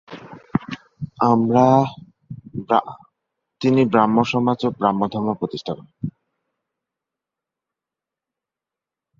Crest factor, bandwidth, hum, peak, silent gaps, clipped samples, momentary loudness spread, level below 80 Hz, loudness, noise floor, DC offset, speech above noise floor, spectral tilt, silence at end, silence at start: 20 dB; 7.4 kHz; none; -2 dBFS; none; under 0.1%; 20 LU; -58 dBFS; -19 LUFS; -87 dBFS; under 0.1%; 69 dB; -7.5 dB/octave; 3.1 s; 0.1 s